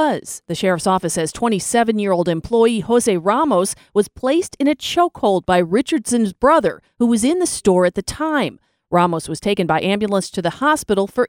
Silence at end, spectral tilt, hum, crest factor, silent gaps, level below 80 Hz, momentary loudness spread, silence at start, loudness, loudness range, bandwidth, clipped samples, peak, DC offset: 0 s; -4.5 dB/octave; none; 16 dB; none; -48 dBFS; 5 LU; 0 s; -18 LUFS; 2 LU; 19 kHz; under 0.1%; -2 dBFS; under 0.1%